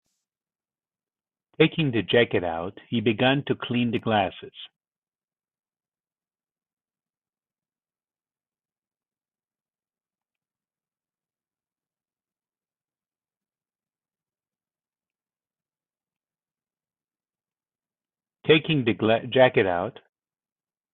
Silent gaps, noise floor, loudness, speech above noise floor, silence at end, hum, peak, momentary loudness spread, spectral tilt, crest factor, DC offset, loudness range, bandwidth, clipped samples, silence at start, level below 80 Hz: 4.98-5.02 s, 6.00-6.04 s, 6.73-6.77 s; under -90 dBFS; -23 LUFS; over 67 dB; 1.05 s; none; -6 dBFS; 14 LU; -9.5 dB/octave; 24 dB; under 0.1%; 7 LU; 4.2 kHz; under 0.1%; 1.6 s; -66 dBFS